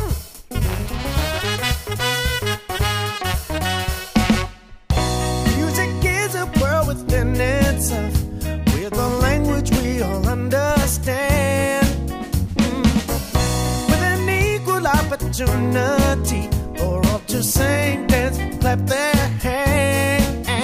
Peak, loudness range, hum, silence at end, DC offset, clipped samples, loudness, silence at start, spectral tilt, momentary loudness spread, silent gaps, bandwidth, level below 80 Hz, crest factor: -2 dBFS; 3 LU; none; 0 s; under 0.1%; under 0.1%; -20 LUFS; 0 s; -5 dB/octave; 5 LU; none; 15.5 kHz; -26 dBFS; 16 dB